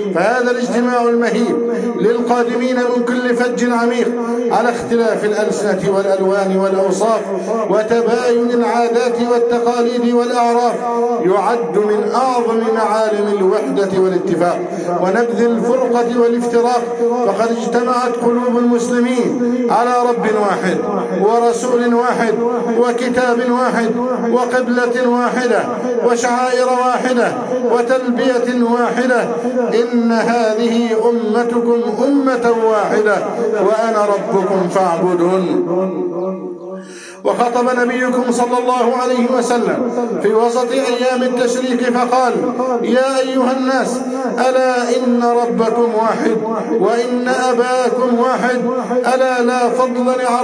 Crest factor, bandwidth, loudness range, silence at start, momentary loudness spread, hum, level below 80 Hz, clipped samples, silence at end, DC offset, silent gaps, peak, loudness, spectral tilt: 12 dB; 10.5 kHz; 1 LU; 0 s; 3 LU; none; -64 dBFS; under 0.1%; 0 s; under 0.1%; none; -2 dBFS; -15 LUFS; -5 dB/octave